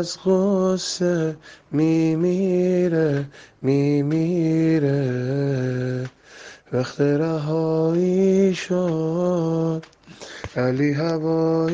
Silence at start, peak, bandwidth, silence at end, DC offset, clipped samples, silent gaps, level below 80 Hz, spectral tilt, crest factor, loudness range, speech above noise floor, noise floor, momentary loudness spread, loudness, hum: 0 s; -8 dBFS; 9.6 kHz; 0 s; under 0.1%; under 0.1%; none; -58 dBFS; -7 dB/octave; 14 dB; 2 LU; 23 dB; -44 dBFS; 9 LU; -21 LUFS; none